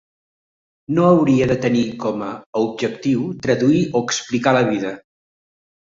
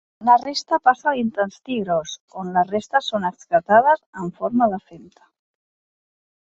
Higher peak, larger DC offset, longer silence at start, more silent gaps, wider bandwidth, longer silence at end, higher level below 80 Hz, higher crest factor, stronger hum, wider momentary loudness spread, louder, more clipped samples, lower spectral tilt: about the same, -2 dBFS vs -2 dBFS; neither; first, 0.9 s vs 0.2 s; second, 2.46-2.53 s vs 2.20-2.28 s, 4.06-4.13 s; about the same, 7.8 kHz vs 7.8 kHz; second, 0.9 s vs 1.55 s; first, -52 dBFS vs -64 dBFS; about the same, 18 dB vs 20 dB; neither; about the same, 10 LU vs 12 LU; about the same, -18 LUFS vs -20 LUFS; neither; about the same, -6 dB/octave vs -5 dB/octave